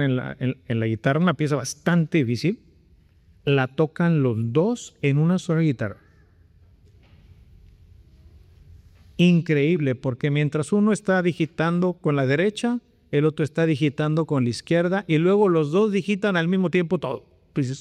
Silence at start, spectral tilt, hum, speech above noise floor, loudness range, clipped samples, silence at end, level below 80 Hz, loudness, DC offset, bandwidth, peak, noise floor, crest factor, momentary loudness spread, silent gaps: 0 s; -7 dB/octave; none; 34 dB; 5 LU; under 0.1%; 0 s; -58 dBFS; -22 LUFS; under 0.1%; 11.5 kHz; -8 dBFS; -56 dBFS; 14 dB; 7 LU; none